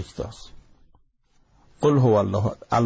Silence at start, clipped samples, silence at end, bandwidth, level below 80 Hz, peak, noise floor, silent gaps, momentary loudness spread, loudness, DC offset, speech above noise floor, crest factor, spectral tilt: 0 s; under 0.1%; 0 s; 8 kHz; -48 dBFS; -8 dBFS; -62 dBFS; none; 17 LU; -22 LUFS; under 0.1%; 40 dB; 16 dB; -8 dB/octave